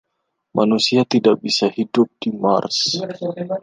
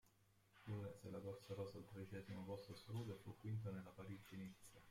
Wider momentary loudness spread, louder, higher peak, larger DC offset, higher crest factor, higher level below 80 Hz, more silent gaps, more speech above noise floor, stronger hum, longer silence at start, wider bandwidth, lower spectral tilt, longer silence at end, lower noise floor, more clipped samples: about the same, 9 LU vs 7 LU; first, -18 LUFS vs -54 LUFS; first, -2 dBFS vs -38 dBFS; neither; about the same, 16 dB vs 16 dB; first, -66 dBFS vs -78 dBFS; neither; first, 56 dB vs 24 dB; neither; first, 0.55 s vs 0.05 s; second, 9.8 kHz vs 16.5 kHz; second, -4.5 dB/octave vs -7 dB/octave; about the same, 0 s vs 0 s; about the same, -74 dBFS vs -77 dBFS; neither